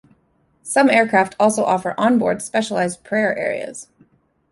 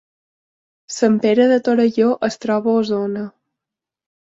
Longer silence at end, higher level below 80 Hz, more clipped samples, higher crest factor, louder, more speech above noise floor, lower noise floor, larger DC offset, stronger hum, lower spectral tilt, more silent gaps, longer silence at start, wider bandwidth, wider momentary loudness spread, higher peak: second, 0.7 s vs 0.95 s; about the same, -62 dBFS vs -64 dBFS; neither; about the same, 18 dB vs 16 dB; about the same, -18 LUFS vs -17 LUFS; second, 44 dB vs 69 dB; second, -62 dBFS vs -86 dBFS; neither; neither; about the same, -4.5 dB/octave vs -5.5 dB/octave; neither; second, 0.65 s vs 0.9 s; first, 11.5 kHz vs 8 kHz; about the same, 12 LU vs 12 LU; about the same, -2 dBFS vs -2 dBFS